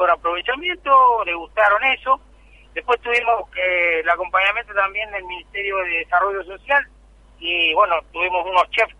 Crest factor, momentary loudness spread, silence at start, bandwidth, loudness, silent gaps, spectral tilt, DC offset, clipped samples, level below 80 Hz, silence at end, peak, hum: 16 dB; 10 LU; 0 s; 10.5 kHz; -19 LUFS; none; -3 dB/octave; under 0.1%; under 0.1%; -48 dBFS; 0.1 s; -2 dBFS; none